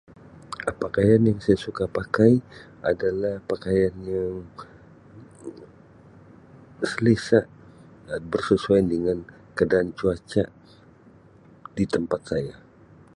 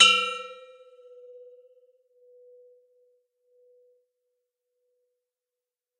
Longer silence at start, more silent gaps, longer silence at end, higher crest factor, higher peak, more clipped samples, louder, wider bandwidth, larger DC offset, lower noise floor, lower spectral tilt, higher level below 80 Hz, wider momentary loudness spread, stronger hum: first, 0.35 s vs 0 s; neither; second, 0.65 s vs 5.45 s; second, 20 dB vs 30 dB; about the same, -4 dBFS vs -2 dBFS; neither; about the same, -24 LUFS vs -22 LUFS; first, 11 kHz vs 9.6 kHz; neither; second, -52 dBFS vs under -90 dBFS; first, -7.5 dB/octave vs 1.5 dB/octave; first, -50 dBFS vs under -90 dBFS; second, 18 LU vs 30 LU; neither